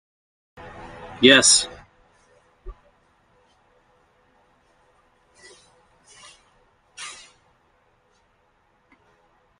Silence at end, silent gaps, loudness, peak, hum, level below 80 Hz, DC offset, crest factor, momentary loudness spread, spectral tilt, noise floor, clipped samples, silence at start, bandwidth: 2.5 s; none; -15 LUFS; 0 dBFS; none; -54 dBFS; under 0.1%; 26 dB; 30 LU; -1 dB/octave; -64 dBFS; under 0.1%; 1.05 s; 12.5 kHz